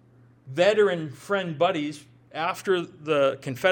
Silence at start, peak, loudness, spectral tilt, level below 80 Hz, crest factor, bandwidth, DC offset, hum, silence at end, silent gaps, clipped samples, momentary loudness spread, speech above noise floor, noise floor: 0.45 s; -6 dBFS; -25 LUFS; -5 dB/octave; -72 dBFS; 20 dB; 18 kHz; under 0.1%; none; 0 s; none; under 0.1%; 13 LU; 26 dB; -51 dBFS